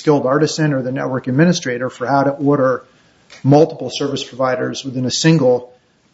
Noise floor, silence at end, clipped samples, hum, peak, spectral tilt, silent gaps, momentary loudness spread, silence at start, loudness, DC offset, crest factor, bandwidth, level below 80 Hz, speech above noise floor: -46 dBFS; 0.5 s; under 0.1%; none; 0 dBFS; -5.5 dB/octave; none; 9 LU; 0 s; -16 LUFS; under 0.1%; 16 dB; 8 kHz; -58 dBFS; 30 dB